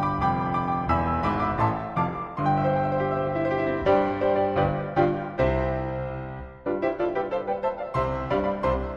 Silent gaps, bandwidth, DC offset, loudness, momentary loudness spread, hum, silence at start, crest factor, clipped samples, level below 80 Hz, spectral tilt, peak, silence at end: none; 7.6 kHz; under 0.1%; -26 LUFS; 6 LU; none; 0 s; 16 dB; under 0.1%; -40 dBFS; -9 dB/octave; -10 dBFS; 0 s